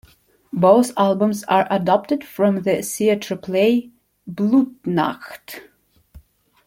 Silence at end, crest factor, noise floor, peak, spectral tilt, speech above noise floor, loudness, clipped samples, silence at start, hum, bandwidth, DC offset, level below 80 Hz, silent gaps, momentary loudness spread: 0.5 s; 18 dB; -53 dBFS; -2 dBFS; -6 dB/octave; 35 dB; -19 LUFS; under 0.1%; 0.55 s; none; 17 kHz; under 0.1%; -58 dBFS; none; 19 LU